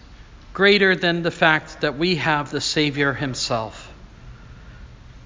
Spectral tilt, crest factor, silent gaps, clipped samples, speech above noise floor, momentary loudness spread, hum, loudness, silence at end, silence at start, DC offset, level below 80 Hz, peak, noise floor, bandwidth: -4.5 dB/octave; 20 dB; none; under 0.1%; 23 dB; 11 LU; none; -19 LUFS; 0 s; 0.1 s; under 0.1%; -46 dBFS; -2 dBFS; -43 dBFS; 7.6 kHz